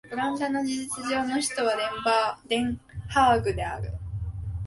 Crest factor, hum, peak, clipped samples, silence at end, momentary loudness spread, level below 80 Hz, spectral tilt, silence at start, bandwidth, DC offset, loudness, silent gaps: 18 dB; none; -10 dBFS; under 0.1%; 0 s; 13 LU; -42 dBFS; -4.5 dB/octave; 0.05 s; 12 kHz; under 0.1%; -27 LUFS; none